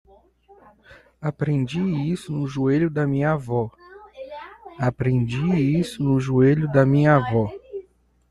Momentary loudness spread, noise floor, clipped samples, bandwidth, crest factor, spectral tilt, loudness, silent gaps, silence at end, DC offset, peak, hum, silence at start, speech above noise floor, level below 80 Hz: 20 LU; -54 dBFS; under 0.1%; 11.5 kHz; 18 dB; -8.5 dB/octave; -22 LUFS; none; 0.5 s; under 0.1%; -4 dBFS; none; 0.9 s; 33 dB; -50 dBFS